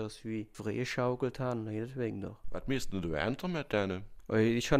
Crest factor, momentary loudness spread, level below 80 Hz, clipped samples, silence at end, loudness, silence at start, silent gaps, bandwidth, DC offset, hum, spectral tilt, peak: 20 dB; 9 LU; -50 dBFS; under 0.1%; 0 s; -35 LUFS; 0 s; none; 15 kHz; under 0.1%; none; -6 dB/octave; -14 dBFS